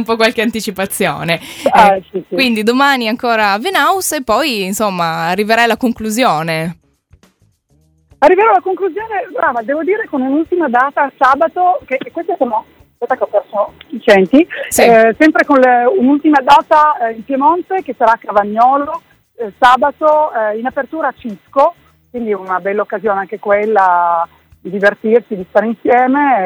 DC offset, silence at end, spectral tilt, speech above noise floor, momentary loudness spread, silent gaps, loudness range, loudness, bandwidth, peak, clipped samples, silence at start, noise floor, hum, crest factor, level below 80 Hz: under 0.1%; 0 s; -4 dB/octave; 42 dB; 11 LU; none; 6 LU; -13 LUFS; over 20 kHz; 0 dBFS; 0.2%; 0 s; -55 dBFS; none; 12 dB; -50 dBFS